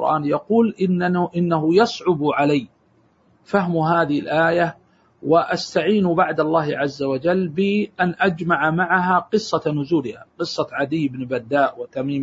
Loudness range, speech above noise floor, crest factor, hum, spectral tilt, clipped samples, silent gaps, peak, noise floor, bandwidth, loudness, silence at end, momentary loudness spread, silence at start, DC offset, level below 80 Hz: 2 LU; 39 dB; 16 dB; none; -6.5 dB/octave; under 0.1%; none; -4 dBFS; -59 dBFS; 8 kHz; -20 LUFS; 0 s; 6 LU; 0 s; under 0.1%; -60 dBFS